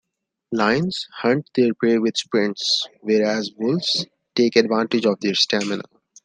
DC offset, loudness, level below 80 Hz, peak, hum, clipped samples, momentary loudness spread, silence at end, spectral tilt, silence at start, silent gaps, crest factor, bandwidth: under 0.1%; -20 LUFS; -64 dBFS; -2 dBFS; none; under 0.1%; 5 LU; 0.45 s; -4.5 dB/octave; 0.5 s; none; 18 dB; 9.8 kHz